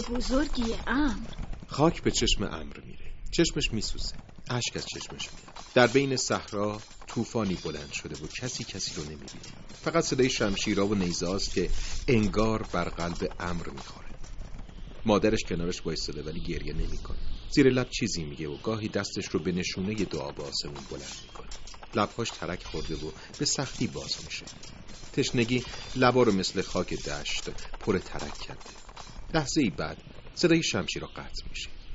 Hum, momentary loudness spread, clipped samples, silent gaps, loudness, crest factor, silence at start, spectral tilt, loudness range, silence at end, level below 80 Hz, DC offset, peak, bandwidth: none; 18 LU; under 0.1%; none; -29 LUFS; 24 dB; 0 s; -4 dB/octave; 5 LU; 0 s; -40 dBFS; under 0.1%; -6 dBFS; 8 kHz